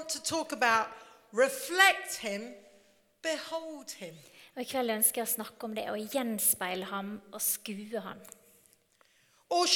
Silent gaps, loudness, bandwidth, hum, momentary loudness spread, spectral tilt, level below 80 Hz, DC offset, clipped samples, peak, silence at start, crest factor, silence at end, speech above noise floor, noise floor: none; -30 LUFS; 19 kHz; none; 16 LU; -1.5 dB/octave; -78 dBFS; under 0.1%; under 0.1%; -6 dBFS; 0 s; 26 dB; 0 s; 35 dB; -67 dBFS